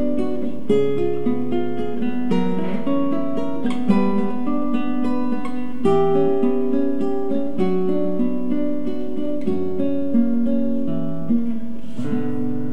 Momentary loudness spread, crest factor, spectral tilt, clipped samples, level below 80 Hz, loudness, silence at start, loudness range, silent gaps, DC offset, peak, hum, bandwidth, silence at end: 7 LU; 16 dB; -8.5 dB/octave; under 0.1%; -52 dBFS; -22 LUFS; 0 s; 2 LU; none; 10%; -4 dBFS; none; 9.4 kHz; 0 s